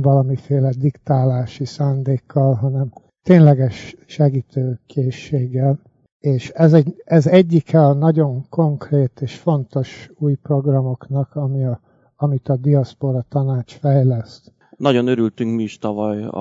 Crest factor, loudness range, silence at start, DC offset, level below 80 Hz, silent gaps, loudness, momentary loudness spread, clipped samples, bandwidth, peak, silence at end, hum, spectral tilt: 16 dB; 5 LU; 0 s; under 0.1%; -60 dBFS; 6.12-6.20 s; -18 LUFS; 11 LU; under 0.1%; 7.4 kHz; 0 dBFS; 0 s; none; -9 dB/octave